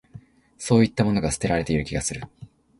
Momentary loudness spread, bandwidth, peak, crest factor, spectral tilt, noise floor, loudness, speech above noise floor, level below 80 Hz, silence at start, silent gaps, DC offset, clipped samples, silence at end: 16 LU; 11.5 kHz; -4 dBFS; 20 dB; -5.5 dB/octave; -47 dBFS; -23 LUFS; 25 dB; -42 dBFS; 0.15 s; none; under 0.1%; under 0.1%; 0.35 s